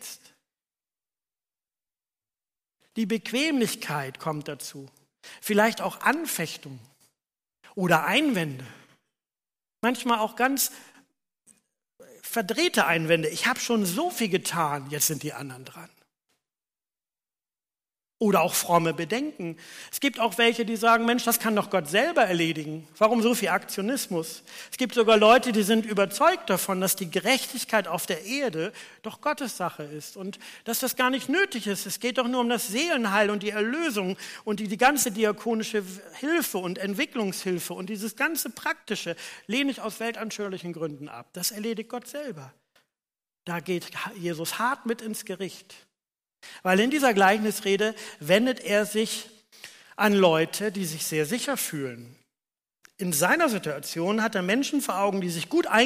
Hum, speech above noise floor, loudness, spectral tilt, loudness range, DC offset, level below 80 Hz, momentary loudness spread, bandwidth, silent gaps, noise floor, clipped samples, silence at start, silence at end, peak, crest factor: none; over 64 dB; -25 LUFS; -3.5 dB/octave; 9 LU; under 0.1%; -72 dBFS; 15 LU; 15.5 kHz; none; under -90 dBFS; under 0.1%; 0 s; 0 s; -6 dBFS; 20 dB